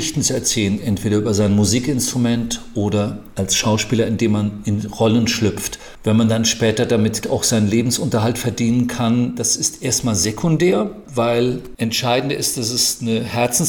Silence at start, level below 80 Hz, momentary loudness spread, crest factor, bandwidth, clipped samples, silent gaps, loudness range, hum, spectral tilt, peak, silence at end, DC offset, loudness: 0 s; -44 dBFS; 5 LU; 12 dB; 19 kHz; under 0.1%; none; 1 LU; none; -4.5 dB/octave; -6 dBFS; 0 s; under 0.1%; -18 LUFS